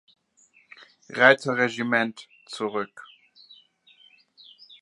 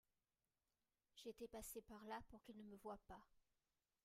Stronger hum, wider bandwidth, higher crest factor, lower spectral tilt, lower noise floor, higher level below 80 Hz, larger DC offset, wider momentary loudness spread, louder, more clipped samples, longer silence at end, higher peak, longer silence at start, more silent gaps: neither; second, 11 kHz vs 16 kHz; first, 26 dB vs 18 dB; about the same, -4.5 dB/octave vs -4 dB/octave; second, -61 dBFS vs under -90 dBFS; about the same, -80 dBFS vs -76 dBFS; neither; first, 20 LU vs 7 LU; first, -23 LUFS vs -58 LUFS; neither; first, 1.75 s vs 0.65 s; first, -2 dBFS vs -42 dBFS; about the same, 1.1 s vs 1.15 s; neither